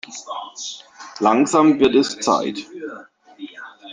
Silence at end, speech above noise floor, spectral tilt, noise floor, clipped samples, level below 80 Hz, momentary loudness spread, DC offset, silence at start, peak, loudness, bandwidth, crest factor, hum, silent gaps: 0 s; 19 dB; -4 dB/octave; -38 dBFS; under 0.1%; -60 dBFS; 23 LU; under 0.1%; 0.1 s; -2 dBFS; -17 LUFS; 10 kHz; 18 dB; none; none